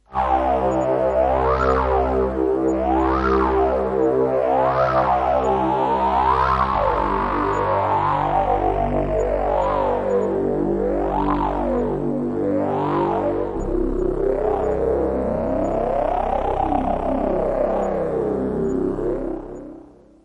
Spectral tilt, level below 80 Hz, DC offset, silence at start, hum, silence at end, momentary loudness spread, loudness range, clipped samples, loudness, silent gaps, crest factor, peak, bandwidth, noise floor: -8 dB/octave; -32 dBFS; under 0.1%; 0.1 s; none; 0.45 s; 4 LU; 3 LU; under 0.1%; -20 LUFS; none; 16 dB; -4 dBFS; 9 kHz; -44 dBFS